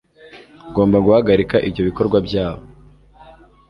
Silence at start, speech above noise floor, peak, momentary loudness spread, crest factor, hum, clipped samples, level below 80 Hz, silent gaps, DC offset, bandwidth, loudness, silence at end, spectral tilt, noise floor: 0.35 s; 31 dB; -2 dBFS; 11 LU; 16 dB; none; under 0.1%; -40 dBFS; none; under 0.1%; 6 kHz; -17 LUFS; 1.1 s; -9 dB/octave; -46 dBFS